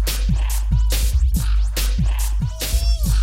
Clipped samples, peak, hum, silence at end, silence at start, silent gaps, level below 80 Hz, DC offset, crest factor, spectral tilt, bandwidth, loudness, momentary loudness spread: under 0.1%; -8 dBFS; none; 0 s; 0 s; none; -18 dBFS; under 0.1%; 10 dB; -4.5 dB/octave; 16.5 kHz; -21 LUFS; 3 LU